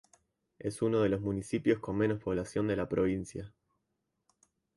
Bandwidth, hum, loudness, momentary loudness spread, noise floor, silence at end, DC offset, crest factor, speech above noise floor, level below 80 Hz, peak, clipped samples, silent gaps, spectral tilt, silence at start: 11.5 kHz; none; -32 LUFS; 11 LU; -83 dBFS; 1.3 s; under 0.1%; 18 dB; 51 dB; -58 dBFS; -16 dBFS; under 0.1%; none; -7 dB/octave; 0.65 s